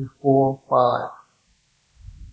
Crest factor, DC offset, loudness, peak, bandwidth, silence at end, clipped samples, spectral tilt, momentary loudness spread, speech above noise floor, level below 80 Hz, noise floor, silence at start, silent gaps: 18 dB; under 0.1%; -20 LUFS; -4 dBFS; 8 kHz; 0.05 s; under 0.1%; -9 dB/octave; 9 LU; 43 dB; -50 dBFS; -64 dBFS; 0 s; none